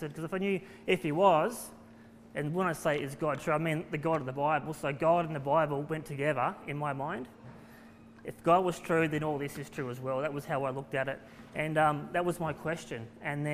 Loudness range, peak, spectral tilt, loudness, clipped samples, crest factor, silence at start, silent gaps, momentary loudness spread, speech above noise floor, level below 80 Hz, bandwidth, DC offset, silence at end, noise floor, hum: 2 LU; -12 dBFS; -6 dB/octave; -32 LUFS; under 0.1%; 20 dB; 0 s; none; 11 LU; 22 dB; -64 dBFS; 15.5 kHz; under 0.1%; 0 s; -54 dBFS; none